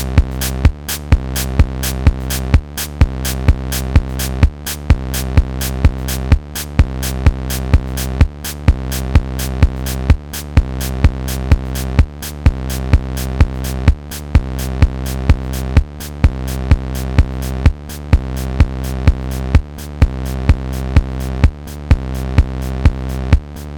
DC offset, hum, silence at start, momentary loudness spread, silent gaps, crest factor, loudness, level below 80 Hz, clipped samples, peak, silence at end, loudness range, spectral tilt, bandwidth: under 0.1%; none; 0 s; 5 LU; none; 14 dB; -17 LUFS; -16 dBFS; under 0.1%; 0 dBFS; 0 s; 1 LU; -5.5 dB/octave; 20 kHz